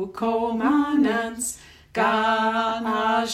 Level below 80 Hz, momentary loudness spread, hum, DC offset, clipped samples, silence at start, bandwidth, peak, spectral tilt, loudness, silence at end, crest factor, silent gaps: -56 dBFS; 9 LU; none; under 0.1%; under 0.1%; 0 s; 15 kHz; -10 dBFS; -3.5 dB/octave; -23 LUFS; 0 s; 14 dB; none